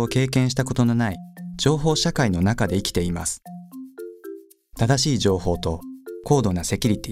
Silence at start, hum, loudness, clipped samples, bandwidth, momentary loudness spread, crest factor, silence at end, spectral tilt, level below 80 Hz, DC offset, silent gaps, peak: 0 s; none; -22 LUFS; under 0.1%; 16 kHz; 18 LU; 18 dB; 0 s; -5 dB/octave; -40 dBFS; under 0.1%; none; -4 dBFS